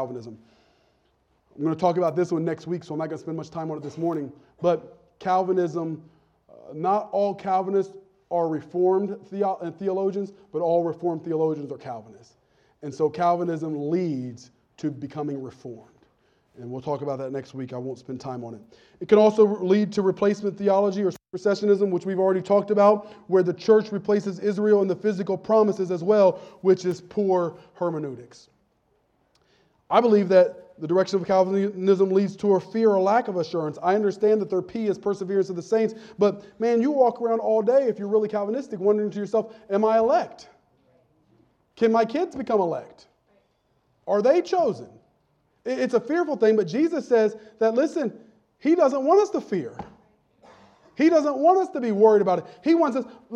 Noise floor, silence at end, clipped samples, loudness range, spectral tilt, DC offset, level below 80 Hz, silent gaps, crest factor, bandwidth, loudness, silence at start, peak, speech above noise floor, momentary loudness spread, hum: -68 dBFS; 0 s; under 0.1%; 6 LU; -7 dB/octave; under 0.1%; -70 dBFS; none; 20 dB; 8.2 kHz; -23 LUFS; 0 s; -4 dBFS; 45 dB; 14 LU; none